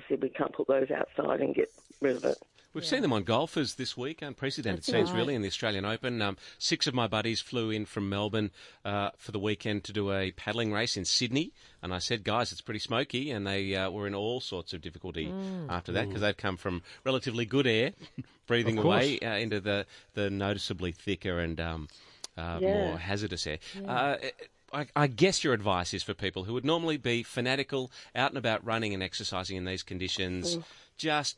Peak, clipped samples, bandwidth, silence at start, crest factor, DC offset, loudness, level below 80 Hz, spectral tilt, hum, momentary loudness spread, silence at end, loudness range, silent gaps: -12 dBFS; under 0.1%; 11.5 kHz; 0 s; 20 dB; under 0.1%; -31 LUFS; -60 dBFS; -4.5 dB/octave; none; 10 LU; 0.05 s; 4 LU; none